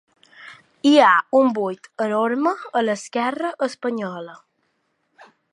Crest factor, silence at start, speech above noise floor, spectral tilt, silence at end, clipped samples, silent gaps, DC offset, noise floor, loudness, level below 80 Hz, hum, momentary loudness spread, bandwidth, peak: 20 dB; 0.4 s; 50 dB; -4.5 dB/octave; 1.2 s; under 0.1%; none; under 0.1%; -70 dBFS; -20 LUFS; -78 dBFS; none; 14 LU; 11 kHz; -2 dBFS